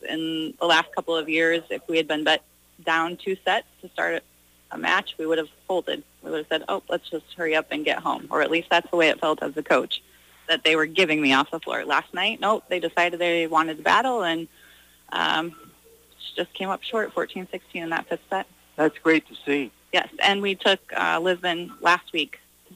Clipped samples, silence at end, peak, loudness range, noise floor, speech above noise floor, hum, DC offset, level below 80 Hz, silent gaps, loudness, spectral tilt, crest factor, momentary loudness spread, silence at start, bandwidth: under 0.1%; 0.4 s; -8 dBFS; 6 LU; -54 dBFS; 30 dB; 60 Hz at -65 dBFS; under 0.1%; -66 dBFS; none; -24 LUFS; -3.5 dB/octave; 18 dB; 11 LU; 0.05 s; 15.5 kHz